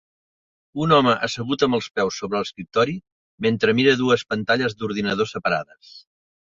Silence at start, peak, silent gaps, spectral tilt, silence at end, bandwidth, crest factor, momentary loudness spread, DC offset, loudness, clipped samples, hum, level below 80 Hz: 0.75 s; -2 dBFS; 3.12-3.38 s; -5 dB/octave; 0.5 s; 7.6 kHz; 20 dB; 9 LU; under 0.1%; -21 LUFS; under 0.1%; none; -56 dBFS